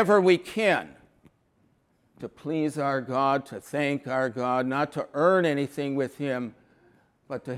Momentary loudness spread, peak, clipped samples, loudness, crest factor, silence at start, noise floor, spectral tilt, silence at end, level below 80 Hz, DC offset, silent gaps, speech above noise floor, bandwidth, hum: 16 LU; -8 dBFS; under 0.1%; -26 LUFS; 20 dB; 0 s; -67 dBFS; -6 dB/octave; 0 s; -70 dBFS; under 0.1%; none; 41 dB; 15 kHz; none